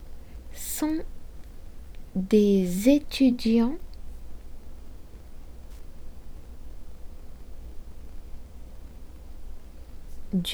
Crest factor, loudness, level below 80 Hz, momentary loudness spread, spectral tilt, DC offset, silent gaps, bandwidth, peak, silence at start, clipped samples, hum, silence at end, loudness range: 20 dB; -24 LUFS; -40 dBFS; 27 LU; -6 dB/octave; under 0.1%; none; over 20 kHz; -8 dBFS; 0 s; under 0.1%; none; 0 s; 23 LU